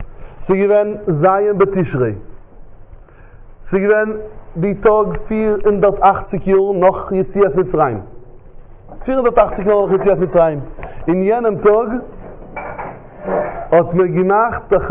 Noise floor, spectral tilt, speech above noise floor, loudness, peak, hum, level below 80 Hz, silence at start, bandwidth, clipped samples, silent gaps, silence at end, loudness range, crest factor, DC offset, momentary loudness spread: -38 dBFS; -12 dB/octave; 24 dB; -15 LUFS; 0 dBFS; none; -36 dBFS; 0 s; 3.8 kHz; under 0.1%; none; 0 s; 4 LU; 16 dB; under 0.1%; 15 LU